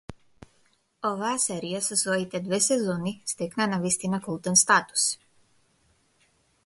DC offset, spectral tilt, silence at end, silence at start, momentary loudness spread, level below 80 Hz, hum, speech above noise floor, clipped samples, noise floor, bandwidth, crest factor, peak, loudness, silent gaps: under 0.1%; -2.5 dB/octave; 1.5 s; 0.1 s; 10 LU; -64 dBFS; none; 41 dB; under 0.1%; -67 dBFS; 12 kHz; 22 dB; -6 dBFS; -25 LUFS; none